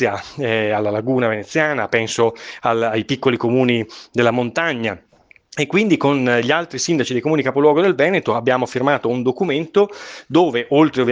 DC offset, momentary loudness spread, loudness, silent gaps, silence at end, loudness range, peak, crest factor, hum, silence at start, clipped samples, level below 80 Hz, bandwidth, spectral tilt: under 0.1%; 6 LU; -18 LUFS; none; 0 s; 2 LU; 0 dBFS; 18 dB; none; 0 s; under 0.1%; -60 dBFS; 9.8 kHz; -5 dB/octave